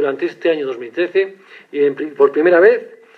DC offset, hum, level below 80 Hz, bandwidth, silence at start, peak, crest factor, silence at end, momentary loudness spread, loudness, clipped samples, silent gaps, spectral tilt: under 0.1%; none; -68 dBFS; 6 kHz; 0 s; 0 dBFS; 16 dB; 0.25 s; 12 LU; -16 LUFS; under 0.1%; none; -6.5 dB/octave